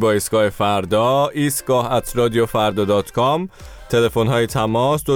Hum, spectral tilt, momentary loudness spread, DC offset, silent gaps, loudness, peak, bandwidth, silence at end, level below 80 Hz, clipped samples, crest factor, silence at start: none; -5 dB/octave; 3 LU; under 0.1%; none; -18 LUFS; -6 dBFS; 19.5 kHz; 0 s; -42 dBFS; under 0.1%; 12 dB; 0 s